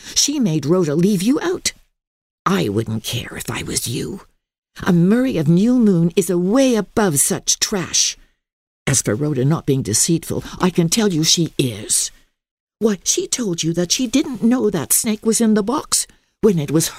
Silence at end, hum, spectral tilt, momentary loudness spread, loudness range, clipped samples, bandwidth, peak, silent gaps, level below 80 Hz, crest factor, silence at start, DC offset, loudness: 0 s; none; -4 dB/octave; 9 LU; 4 LU; under 0.1%; 16 kHz; -2 dBFS; 2.07-2.45 s, 4.58-4.62 s, 8.53-8.85 s, 12.51-12.67 s; -46 dBFS; 16 dB; 0 s; under 0.1%; -17 LUFS